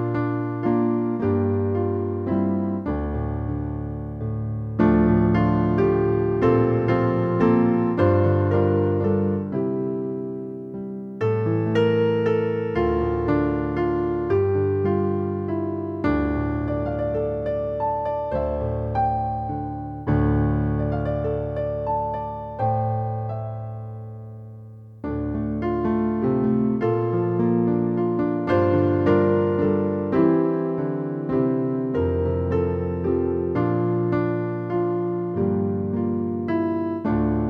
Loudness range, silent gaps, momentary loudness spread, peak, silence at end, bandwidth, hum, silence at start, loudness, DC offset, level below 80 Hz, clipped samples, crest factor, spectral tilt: 6 LU; none; 9 LU; -6 dBFS; 0 s; 5.6 kHz; none; 0 s; -23 LUFS; under 0.1%; -38 dBFS; under 0.1%; 16 dB; -10.5 dB/octave